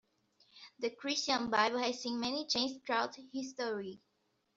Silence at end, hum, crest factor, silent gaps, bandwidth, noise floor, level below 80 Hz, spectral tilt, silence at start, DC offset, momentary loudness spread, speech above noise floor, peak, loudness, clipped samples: 0.6 s; none; 22 dB; none; 7.8 kHz; -72 dBFS; -76 dBFS; -2 dB/octave; 0.55 s; under 0.1%; 12 LU; 36 dB; -16 dBFS; -35 LUFS; under 0.1%